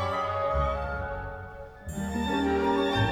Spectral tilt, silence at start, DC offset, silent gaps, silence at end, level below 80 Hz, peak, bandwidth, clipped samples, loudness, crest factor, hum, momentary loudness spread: -6 dB/octave; 0 s; under 0.1%; none; 0 s; -40 dBFS; -14 dBFS; 17 kHz; under 0.1%; -29 LUFS; 16 dB; none; 14 LU